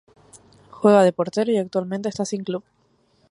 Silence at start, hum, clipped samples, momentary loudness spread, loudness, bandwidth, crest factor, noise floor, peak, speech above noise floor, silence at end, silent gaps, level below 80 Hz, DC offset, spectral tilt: 0.75 s; none; under 0.1%; 13 LU; -21 LUFS; 11.5 kHz; 20 dB; -62 dBFS; -2 dBFS; 42 dB; 0.7 s; none; -66 dBFS; under 0.1%; -6 dB/octave